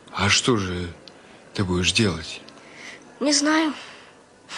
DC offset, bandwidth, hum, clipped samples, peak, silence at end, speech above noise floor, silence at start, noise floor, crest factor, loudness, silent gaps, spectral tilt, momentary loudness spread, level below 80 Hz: under 0.1%; 11.5 kHz; none; under 0.1%; -6 dBFS; 0 s; 28 dB; 0.05 s; -50 dBFS; 20 dB; -21 LUFS; none; -3.5 dB/octave; 21 LU; -44 dBFS